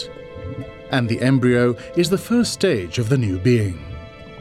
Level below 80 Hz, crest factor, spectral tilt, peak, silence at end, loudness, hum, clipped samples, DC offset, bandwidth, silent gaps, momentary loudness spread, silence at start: -46 dBFS; 16 dB; -6 dB/octave; -4 dBFS; 0 s; -19 LUFS; none; under 0.1%; under 0.1%; 15 kHz; none; 16 LU; 0 s